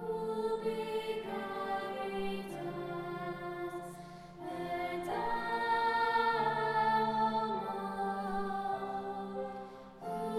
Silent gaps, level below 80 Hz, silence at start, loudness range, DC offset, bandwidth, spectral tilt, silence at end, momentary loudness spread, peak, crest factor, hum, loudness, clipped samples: none; -64 dBFS; 0 s; 8 LU; under 0.1%; 15.5 kHz; -5.5 dB/octave; 0 s; 12 LU; -20 dBFS; 16 dB; none; -36 LUFS; under 0.1%